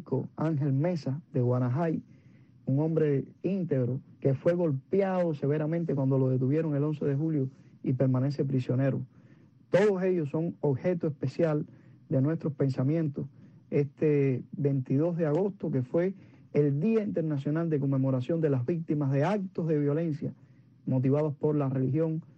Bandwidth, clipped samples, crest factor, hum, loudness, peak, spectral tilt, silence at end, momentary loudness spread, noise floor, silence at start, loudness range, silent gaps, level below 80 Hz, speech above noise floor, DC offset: 7 kHz; under 0.1%; 16 dB; none; -29 LUFS; -12 dBFS; -10 dB/octave; 0.15 s; 6 LU; -57 dBFS; 0 s; 2 LU; none; -70 dBFS; 29 dB; under 0.1%